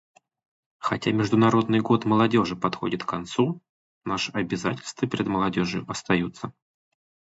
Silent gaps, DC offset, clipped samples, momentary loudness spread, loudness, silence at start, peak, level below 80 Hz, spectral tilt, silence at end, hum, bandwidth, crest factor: 3.69-4.01 s; under 0.1%; under 0.1%; 11 LU; -25 LUFS; 0.8 s; -6 dBFS; -56 dBFS; -6 dB/octave; 0.85 s; none; 8 kHz; 20 dB